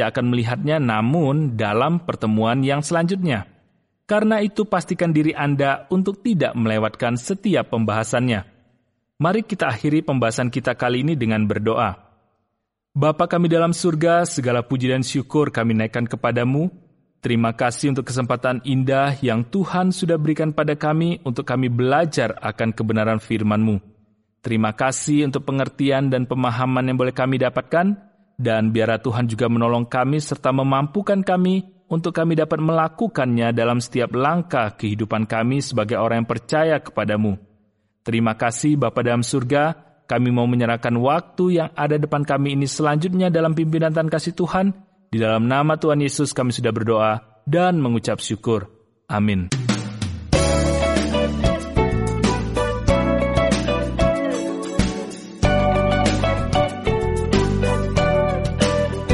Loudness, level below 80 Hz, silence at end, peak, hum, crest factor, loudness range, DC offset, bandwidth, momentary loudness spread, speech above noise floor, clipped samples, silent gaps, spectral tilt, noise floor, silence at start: -20 LUFS; -36 dBFS; 0 s; -4 dBFS; none; 16 dB; 2 LU; under 0.1%; 11.5 kHz; 5 LU; 57 dB; under 0.1%; none; -6 dB/octave; -77 dBFS; 0 s